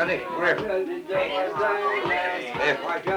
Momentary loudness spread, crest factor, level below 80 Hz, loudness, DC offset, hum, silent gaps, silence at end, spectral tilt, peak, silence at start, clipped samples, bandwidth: 4 LU; 16 dB; -60 dBFS; -25 LUFS; under 0.1%; none; none; 0 s; -5 dB/octave; -10 dBFS; 0 s; under 0.1%; 19.5 kHz